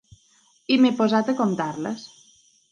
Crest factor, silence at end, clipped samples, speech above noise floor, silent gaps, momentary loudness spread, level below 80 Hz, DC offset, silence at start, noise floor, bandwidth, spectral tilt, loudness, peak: 16 dB; 0.65 s; under 0.1%; 39 dB; none; 15 LU; -68 dBFS; under 0.1%; 0.7 s; -60 dBFS; 9.4 kHz; -5.5 dB/octave; -22 LUFS; -8 dBFS